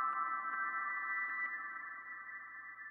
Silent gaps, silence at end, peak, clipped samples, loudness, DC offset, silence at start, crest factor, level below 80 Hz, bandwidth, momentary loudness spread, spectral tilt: none; 0 s; -26 dBFS; under 0.1%; -40 LUFS; under 0.1%; 0 s; 14 dB; under -90 dBFS; 4.2 kHz; 10 LU; -4.5 dB/octave